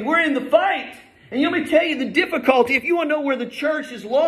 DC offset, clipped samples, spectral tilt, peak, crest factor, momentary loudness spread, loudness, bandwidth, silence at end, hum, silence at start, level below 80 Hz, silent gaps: under 0.1%; under 0.1%; -4.5 dB/octave; -2 dBFS; 18 dB; 7 LU; -20 LUFS; 14 kHz; 0 s; none; 0 s; -62 dBFS; none